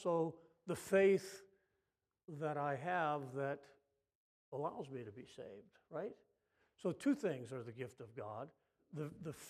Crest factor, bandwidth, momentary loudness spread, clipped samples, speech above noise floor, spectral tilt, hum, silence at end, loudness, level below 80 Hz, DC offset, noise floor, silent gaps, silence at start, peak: 20 dB; 15 kHz; 18 LU; under 0.1%; 49 dB; -6.5 dB/octave; none; 0 s; -41 LUFS; -84 dBFS; under 0.1%; -90 dBFS; 4.15-4.52 s; 0 s; -22 dBFS